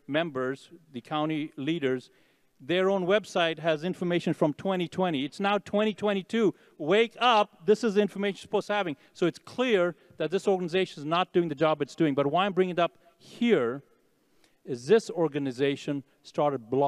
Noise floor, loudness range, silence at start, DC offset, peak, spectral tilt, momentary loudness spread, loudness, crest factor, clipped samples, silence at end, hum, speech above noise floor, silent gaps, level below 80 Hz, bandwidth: -67 dBFS; 3 LU; 0.1 s; under 0.1%; -10 dBFS; -6 dB/octave; 9 LU; -28 LUFS; 18 dB; under 0.1%; 0 s; none; 40 dB; none; -78 dBFS; 12 kHz